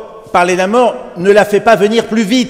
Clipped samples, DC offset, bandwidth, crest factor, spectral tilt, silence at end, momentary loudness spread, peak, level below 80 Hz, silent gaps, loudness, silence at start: 0.5%; under 0.1%; 16 kHz; 10 dB; -4.5 dB/octave; 0 s; 6 LU; 0 dBFS; -48 dBFS; none; -11 LUFS; 0 s